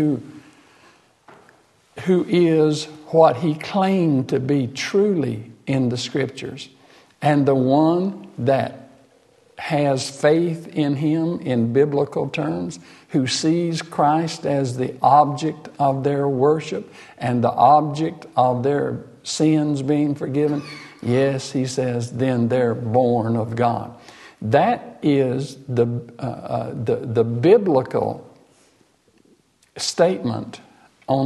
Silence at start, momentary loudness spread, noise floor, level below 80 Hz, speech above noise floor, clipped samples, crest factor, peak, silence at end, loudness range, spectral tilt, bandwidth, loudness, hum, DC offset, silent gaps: 0 s; 12 LU; -59 dBFS; -62 dBFS; 39 dB; under 0.1%; 20 dB; -2 dBFS; 0 s; 3 LU; -6.5 dB/octave; 12 kHz; -20 LUFS; none; under 0.1%; none